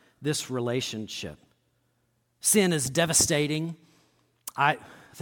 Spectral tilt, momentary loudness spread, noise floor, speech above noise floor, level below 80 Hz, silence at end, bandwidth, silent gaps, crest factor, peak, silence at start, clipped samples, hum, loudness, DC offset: -3 dB/octave; 17 LU; -72 dBFS; 46 dB; -58 dBFS; 0 s; 18 kHz; none; 22 dB; -8 dBFS; 0.2 s; under 0.1%; none; -25 LUFS; under 0.1%